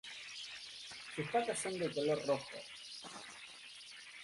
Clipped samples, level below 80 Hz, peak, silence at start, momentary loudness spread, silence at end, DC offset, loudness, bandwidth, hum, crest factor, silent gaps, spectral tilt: under 0.1%; -78 dBFS; -22 dBFS; 0.05 s; 15 LU; 0 s; under 0.1%; -41 LUFS; 11.5 kHz; none; 20 dB; none; -3.5 dB/octave